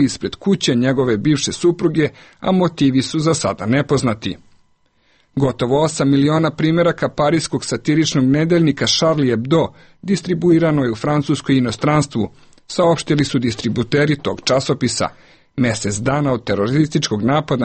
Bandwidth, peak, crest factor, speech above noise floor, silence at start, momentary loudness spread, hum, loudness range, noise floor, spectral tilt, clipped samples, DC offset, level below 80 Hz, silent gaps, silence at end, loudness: 8.8 kHz; -4 dBFS; 14 dB; 43 dB; 0 s; 7 LU; none; 3 LU; -59 dBFS; -5.5 dB/octave; under 0.1%; under 0.1%; -46 dBFS; none; 0 s; -17 LUFS